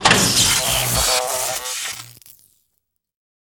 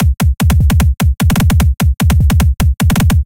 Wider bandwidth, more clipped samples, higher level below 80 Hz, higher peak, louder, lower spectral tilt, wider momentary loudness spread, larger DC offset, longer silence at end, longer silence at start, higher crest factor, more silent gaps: first, over 20 kHz vs 17.5 kHz; neither; second, -40 dBFS vs -14 dBFS; about the same, -2 dBFS vs 0 dBFS; second, -17 LUFS vs -12 LUFS; second, -1.5 dB/octave vs -6 dB/octave; first, 13 LU vs 2 LU; neither; first, 1.35 s vs 0 s; about the same, 0 s vs 0 s; first, 20 dB vs 10 dB; neither